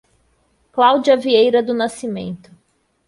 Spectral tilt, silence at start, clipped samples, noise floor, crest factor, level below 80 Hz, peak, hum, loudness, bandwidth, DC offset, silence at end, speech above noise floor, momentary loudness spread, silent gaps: -5 dB/octave; 0.75 s; under 0.1%; -63 dBFS; 16 dB; -60 dBFS; -2 dBFS; none; -16 LUFS; 11.5 kHz; under 0.1%; 0.7 s; 48 dB; 15 LU; none